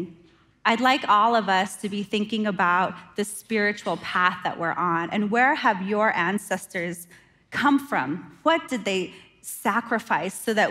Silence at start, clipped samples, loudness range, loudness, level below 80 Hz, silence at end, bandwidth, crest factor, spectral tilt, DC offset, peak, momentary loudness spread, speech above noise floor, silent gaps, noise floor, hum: 0 s; under 0.1%; 3 LU; -24 LUFS; -68 dBFS; 0 s; 16 kHz; 18 dB; -4 dB/octave; under 0.1%; -6 dBFS; 10 LU; 33 dB; none; -56 dBFS; none